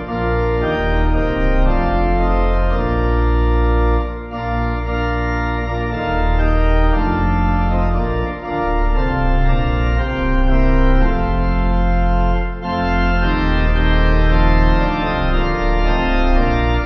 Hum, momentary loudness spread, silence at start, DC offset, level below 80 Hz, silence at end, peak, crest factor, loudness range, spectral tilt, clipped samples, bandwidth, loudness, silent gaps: none; 5 LU; 0 s; under 0.1%; -16 dBFS; 0 s; -2 dBFS; 12 dB; 2 LU; -8.5 dB/octave; under 0.1%; 6 kHz; -18 LUFS; none